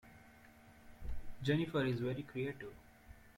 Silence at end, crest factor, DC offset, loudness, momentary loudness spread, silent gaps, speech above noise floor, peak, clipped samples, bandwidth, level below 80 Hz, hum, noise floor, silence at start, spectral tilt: 0.05 s; 18 dB; under 0.1%; -39 LUFS; 25 LU; none; 23 dB; -22 dBFS; under 0.1%; 16.5 kHz; -56 dBFS; none; -61 dBFS; 0.05 s; -7.5 dB/octave